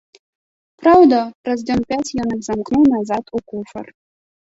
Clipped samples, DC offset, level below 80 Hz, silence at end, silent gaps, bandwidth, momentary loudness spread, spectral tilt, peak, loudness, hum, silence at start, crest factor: under 0.1%; under 0.1%; -50 dBFS; 0.65 s; 1.35-1.44 s; 8 kHz; 18 LU; -6 dB/octave; -2 dBFS; -16 LUFS; none; 0.8 s; 16 dB